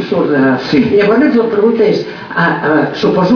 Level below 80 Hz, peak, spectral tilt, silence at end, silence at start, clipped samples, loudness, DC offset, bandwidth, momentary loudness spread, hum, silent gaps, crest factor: -48 dBFS; 0 dBFS; -7.5 dB/octave; 0 s; 0 s; under 0.1%; -11 LUFS; under 0.1%; 5.4 kHz; 4 LU; none; none; 10 dB